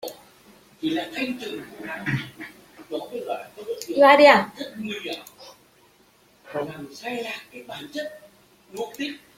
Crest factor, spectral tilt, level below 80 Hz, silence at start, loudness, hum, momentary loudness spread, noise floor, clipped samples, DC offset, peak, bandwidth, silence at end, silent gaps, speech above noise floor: 24 dB; -4.5 dB/octave; -66 dBFS; 0 s; -23 LUFS; none; 22 LU; -58 dBFS; under 0.1%; under 0.1%; -2 dBFS; 16.5 kHz; 0.2 s; none; 34 dB